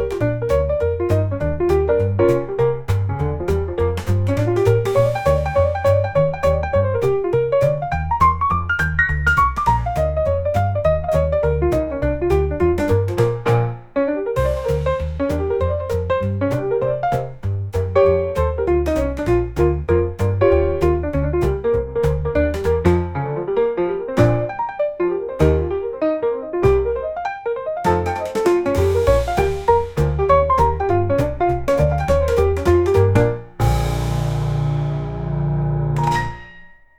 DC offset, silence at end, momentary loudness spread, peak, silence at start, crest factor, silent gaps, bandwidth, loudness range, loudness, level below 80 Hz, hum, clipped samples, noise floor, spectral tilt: 0.3%; 0.25 s; 6 LU; -2 dBFS; 0 s; 16 dB; none; 18 kHz; 3 LU; -19 LUFS; -28 dBFS; none; under 0.1%; -43 dBFS; -8 dB/octave